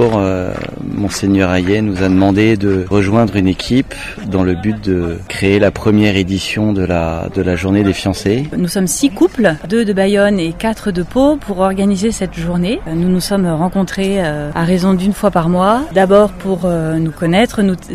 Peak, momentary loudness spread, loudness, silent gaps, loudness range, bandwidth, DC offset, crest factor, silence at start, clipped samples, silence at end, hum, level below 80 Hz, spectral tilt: 0 dBFS; 6 LU; -14 LUFS; none; 2 LU; 15 kHz; under 0.1%; 14 dB; 0 s; under 0.1%; 0 s; none; -34 dBFS; -6 dB/octave